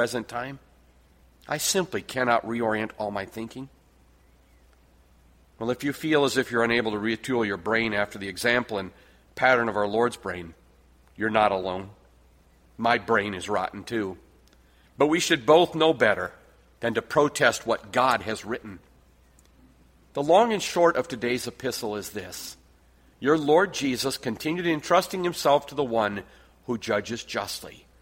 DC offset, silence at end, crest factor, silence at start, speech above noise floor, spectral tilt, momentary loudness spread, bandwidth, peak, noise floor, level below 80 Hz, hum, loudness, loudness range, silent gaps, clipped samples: under 0.1%; 0.3 s; 22 dB; 0 s; 33 dB; -4 dB/octave; 15 LU; 16.5 kHz; -4 dBFS; -58 dBFS; -58 dBFS; none; -25 LUFS; 5 LU; none; under 0.1%